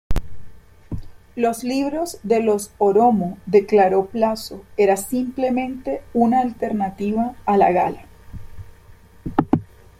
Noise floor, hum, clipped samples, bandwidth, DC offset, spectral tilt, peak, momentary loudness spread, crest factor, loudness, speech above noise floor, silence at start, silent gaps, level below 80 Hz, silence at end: -46 dBFS; none; under 0.1%; 16 kHz; under 0.1%; -6 dB/octave; -2 dBFS; 17 LU; 18 dB; -20 LUFS; 27 dB; 0.1 s; none; -38 dBFS; 0.35 s